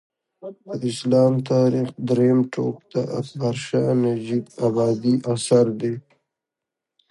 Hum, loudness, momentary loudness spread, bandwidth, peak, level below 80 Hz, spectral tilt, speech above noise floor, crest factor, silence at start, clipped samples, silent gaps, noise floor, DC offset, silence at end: none; -21 LUFS; 10 LU; 11.5 kHz; -4 dBFS; -64 dBFS; -7 dB/octave; 65 dB; 18 dB; 0.45 s; under 0.1%; none; -85 dBFS; under 0.1%; 1.1 s